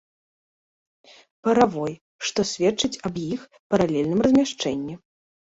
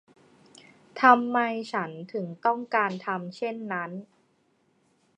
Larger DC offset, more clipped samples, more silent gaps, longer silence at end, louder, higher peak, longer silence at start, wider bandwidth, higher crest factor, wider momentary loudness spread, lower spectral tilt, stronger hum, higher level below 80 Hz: neither; neither; first, 2.01-2.19 s, 3.59-3.70 s vs none; second, 0.6 s vs 1.15 s; first, -23 LUFS vs -26 LUFS; about the same, -2 dBFS vs -4 dBFS; first, 1.45 s vs 0.95 s; second, 8 kHz vs 9.6 kHz; about the same, 22 dB vs 26 dB; second, 12 LU vs 15 LU; about the same, -5 dB/octave vs -6 dB/octave; neither; first, -56 dBFS vs -84 dBFS